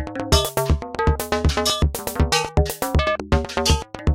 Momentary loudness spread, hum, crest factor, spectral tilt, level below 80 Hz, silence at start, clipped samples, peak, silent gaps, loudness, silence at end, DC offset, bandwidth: 3 LU; none; 18 dB; -4.5 dB/octave; -26 dBFS; 0 s; under 0.1%; -4 dBFS; none; -21 LUFS; 0 s; under 0.1%; 17 kHz